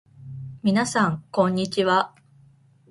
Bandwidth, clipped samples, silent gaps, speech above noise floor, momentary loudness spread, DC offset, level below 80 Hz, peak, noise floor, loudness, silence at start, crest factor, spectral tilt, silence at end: 11.5 kHz; under 0.1%; none; 34 dB; 17 LU; under 0.1%; -60 dBFS; -6 dBFS; -55 dBFS; -23 LUFS; 0.2 s; 18 dB; -5.5 dB/octave; 0.8 s